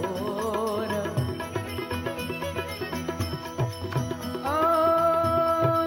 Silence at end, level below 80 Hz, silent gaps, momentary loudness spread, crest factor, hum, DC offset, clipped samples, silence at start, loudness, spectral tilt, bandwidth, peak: 0 s; -54 dBFS; none; 10 LU; 16 dB; none; under 0.1%; under 0.1%; 0 s; -27 LUFS; -6 dB/octave; 17 kHz; -10 dBFS